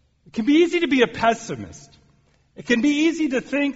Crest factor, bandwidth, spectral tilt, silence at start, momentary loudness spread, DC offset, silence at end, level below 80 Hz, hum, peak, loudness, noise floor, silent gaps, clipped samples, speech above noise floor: 16 dB; 8 kHz; -3 dB/octave; 0.35 s; 15 LU; under 0.1%; 0 s; -58 dBFS; none; -6 dBFS; -20 LUFS; -60 dBFS; none; under 0.1%; 39 dB